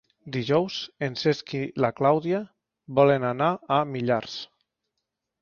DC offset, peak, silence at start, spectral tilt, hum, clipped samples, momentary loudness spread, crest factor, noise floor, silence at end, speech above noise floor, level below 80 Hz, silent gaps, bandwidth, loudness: under 0.1%; -6 dBFS; 0.25 s; -6.5 dB/octave; none; under 0.1%; 12 LU; 20 dB; -82 dBFS; 0.95 s; 58 dB; -66 dBFS; none; 7 kHz; -25 LUFS